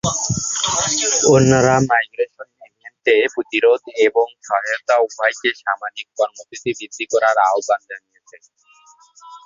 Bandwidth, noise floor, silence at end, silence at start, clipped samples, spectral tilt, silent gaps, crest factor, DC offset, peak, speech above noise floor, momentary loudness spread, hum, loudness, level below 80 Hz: 7.8 kHz; -51 dBFS; 0.05 s; 0.05 s; under 0.1%; -3.5 dB/octave; none; 18 dB; under 0.1%; 0 dBFS; 33 dB; 12 LU; none; -17 LUFS; -50 dBFS